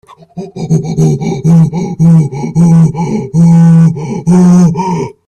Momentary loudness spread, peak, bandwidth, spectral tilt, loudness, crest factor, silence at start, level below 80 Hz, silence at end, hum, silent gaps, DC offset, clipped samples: 10 LU; 0 dBFS; 9 kHz; -8.5 dB/octave; -8 LUFS; 8 dB; 0.35 s; -40 dBFS; 0.15 s; none; none; under 0.1%; under 0.1%